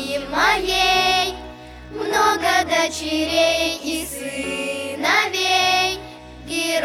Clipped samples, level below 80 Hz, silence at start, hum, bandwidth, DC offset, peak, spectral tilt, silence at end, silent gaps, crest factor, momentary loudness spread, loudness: under 0.1%; -44 dBFS; 0 s; none; 18 kHz; under 0.1%; -4 dBFS; -2 dB/octave; 0 s; none; 16 dB; 14 LU; -19 LUFS